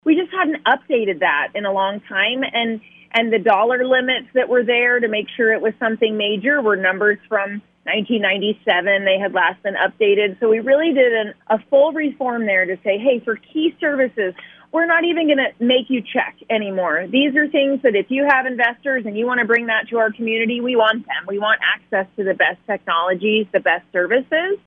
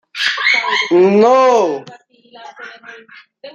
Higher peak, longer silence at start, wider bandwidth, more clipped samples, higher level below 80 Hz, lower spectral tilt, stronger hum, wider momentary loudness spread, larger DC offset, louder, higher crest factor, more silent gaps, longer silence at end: about the same, -2 dBFS vs -2 dBFS; about the same, 0.05 s vs 0.15 s; second, 4.6 kHz vs 9.6 kHz; neither; about the same, -70 dBFS vs -68 dBFS; first, -7 dB/octave vs -4.5 dB/octave; neither; second, 6 LU vs 23 LU; neither; second, -18 LUFS vs -12 LUFS; about the same, 16 dB vs 14 dB; neither; about the same, 0.1 s vs 0.05 s